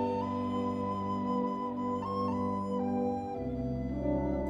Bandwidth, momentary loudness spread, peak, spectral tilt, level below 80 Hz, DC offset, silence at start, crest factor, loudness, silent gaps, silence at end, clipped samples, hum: 7.6 kHz; 3 LU; -20 dBFS; -9 dB/octave; -48 dBFS; under 0.1%; 0 s; 12 dB; -34 LUFS; none; 0 s; under 0.1%; none